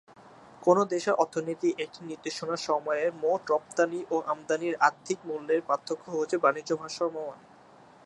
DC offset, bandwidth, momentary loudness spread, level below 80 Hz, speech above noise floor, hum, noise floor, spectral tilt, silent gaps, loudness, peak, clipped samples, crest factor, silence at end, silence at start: under 0.1%; 11.5 kHz; 10 LU; -78 dBFS; 26 dB; none; -55 dBFS; -4.5 dB/octave; none; -29 LUFS; -8 dBFS; under 0.1%; 22 dB; 0.7 s; 0.25 s